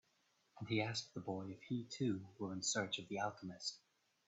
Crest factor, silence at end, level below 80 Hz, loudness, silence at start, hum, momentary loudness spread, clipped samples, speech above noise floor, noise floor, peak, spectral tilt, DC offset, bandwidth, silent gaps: 20 dB; 0.5 s; -82 dBFS; -43 LUFS; 0.55 s; none; 8 LU; under 0.1%; 36 dB; -79 dBFS; -26 dBFS; -4 dB/octave; under 0.1%; 8.2 kHz; none